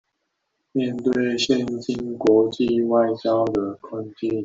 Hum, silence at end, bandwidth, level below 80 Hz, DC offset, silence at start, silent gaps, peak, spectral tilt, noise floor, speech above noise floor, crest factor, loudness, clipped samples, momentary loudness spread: none; 0 s; 7.8 kHz; -56 dBFS; under 0.1%; 0.75 s; none; -6 dBFS; -5.5 dB/octave; -76 dBFS; 55 dB; 16 dB; -22 LUFS; under 0.1%; 10 LU